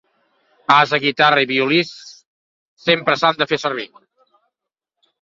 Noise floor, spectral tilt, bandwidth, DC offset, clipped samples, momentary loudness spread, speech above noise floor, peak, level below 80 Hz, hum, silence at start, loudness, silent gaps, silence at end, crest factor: -83 dBFS; -4.5 dB/octave; 7.8 kHz; under 0.1%; under 0.1%; 14 LU; 66 dB; -2 dBFS; -64 dBFS; none; 0.7 s; -16 LUFS; 2.26-2.77 s; 1.35 s; 18 dB